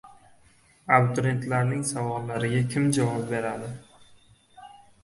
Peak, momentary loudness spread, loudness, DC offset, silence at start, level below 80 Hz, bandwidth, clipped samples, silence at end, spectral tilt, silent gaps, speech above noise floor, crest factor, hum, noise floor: -4 dBFS; 14 LU; -26 LUFS; under 0.1%; 0.05 s; -60 dBFS; 11.5 kHz; under 0.1%; 0.3 s; -6 dB/octave; none; 34 dB; 24 dB; none; -59 dBFS